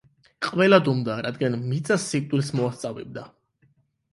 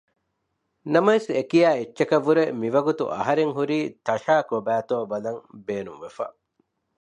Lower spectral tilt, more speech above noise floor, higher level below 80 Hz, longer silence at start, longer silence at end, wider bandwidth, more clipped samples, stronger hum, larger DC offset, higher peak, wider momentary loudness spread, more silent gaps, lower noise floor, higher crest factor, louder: about the same, -5.5 dB/octave vs -6.5 dB/octave; second, 41 dB vs 53 dB; first, -64 dBFS vs -70 dBFS; second, 0.4 s vs 0.85 s; first, 0.85 s vs 0.7 s; first, 11.5 kHz vs 10 kHz; neither; neither; neither; about the same, -4 dBFS vs -4 dBFS; about the same, 16 LU vs 14 LU; neither; second, -64 dBFS vs -76 dBFS; about the same, 20 dB vs 20 dB; about the same, -23 LUFS vs -23 LUFS